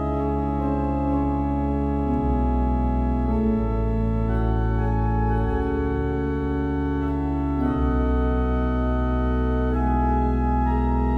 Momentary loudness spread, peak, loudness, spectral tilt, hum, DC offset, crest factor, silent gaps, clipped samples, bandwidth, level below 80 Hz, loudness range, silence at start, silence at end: 2 LU; -10 dBFS; -24 LUFS; -10.5 dB/octave; none; under 0.1%; 12 dB; none; under 0.1%; 4 kHz; -26 dBFS; 1 LU; 0 s; 0 s